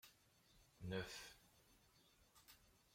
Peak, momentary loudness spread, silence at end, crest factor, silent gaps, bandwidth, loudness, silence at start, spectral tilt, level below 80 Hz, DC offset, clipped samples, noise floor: -34 dBFS; 20 LU; 0 s; 22 dB; none; 16.5 kHz; -52 LUFS; 0.05 s; -4.5 dB/octave; -76 dBFS; under 0.1%; under 0.1%; -75 dBFS